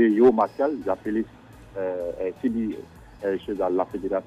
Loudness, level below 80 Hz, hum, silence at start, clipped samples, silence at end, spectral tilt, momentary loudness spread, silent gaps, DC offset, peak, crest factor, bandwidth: -25 LUFS; -54 dBFS; none; 0 s; under 0.1%; 0 s; -8 dB/octave; 15 LU; none; under 0.1%; -6 dBFS; 18 dB; 8 kHz